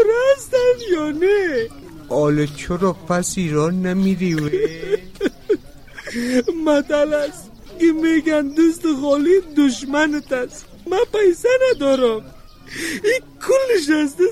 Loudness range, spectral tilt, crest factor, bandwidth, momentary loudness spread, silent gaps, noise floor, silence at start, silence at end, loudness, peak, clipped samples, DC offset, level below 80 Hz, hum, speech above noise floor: 3 LU; -5.5 dB/octave; 12 dB; 15.5 kHz; 9 LU; none; -38 dBFS; 0 s; 0 s; -18 LUFS; -6 dBFS; under 0.1%; 0.3%; -44 dBFS; none; 21 dB